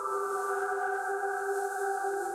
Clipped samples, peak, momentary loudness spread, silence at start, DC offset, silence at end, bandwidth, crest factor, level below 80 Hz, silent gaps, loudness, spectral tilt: under 0.1%; -20 dBFS; 1 LU; 0 s; under 0.1%; 0 s; 16 kHz; 12 dB; -80 dBFS; none; -32 LUFS; -2 dB/octave